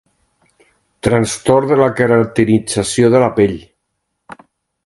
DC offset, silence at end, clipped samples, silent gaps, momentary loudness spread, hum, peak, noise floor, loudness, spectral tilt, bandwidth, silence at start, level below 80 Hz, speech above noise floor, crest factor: under 0.1%; 0.5 s; under 0.1%; none; 5 LU; none; 0 dBFS; -72 dBFS; -13 LUFS; -5.5 dB/octave; 11.5 kHz; 1.05 s; -44 dBFS; 59 dB; 16 dB